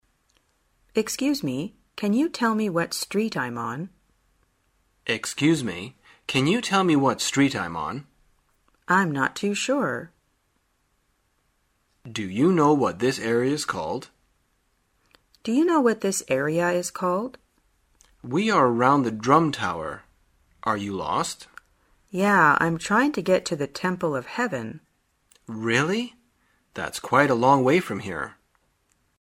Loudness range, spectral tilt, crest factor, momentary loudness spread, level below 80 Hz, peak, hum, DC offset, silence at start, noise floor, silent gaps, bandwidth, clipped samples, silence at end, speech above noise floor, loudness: 4 LU; -5 dB/octave; 22 dB; 15 LU; -62 dBFS; -2 dBFS; none; under 0.1%; 0.95 s; -70 dBFS; none; 16 kHz; under 0.1%; 0.9 s; 47 dB; -23 LUFS